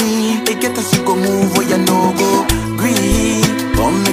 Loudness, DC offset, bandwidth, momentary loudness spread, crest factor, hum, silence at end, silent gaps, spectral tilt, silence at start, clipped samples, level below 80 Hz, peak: -14 LUFS; under 0.1%; 16 kHz; 3 LU; 14 dB; none; 0 s; none; -4.5 dB/octave; 0 s; under 0.1%; -28 dBFS; 0 dBFS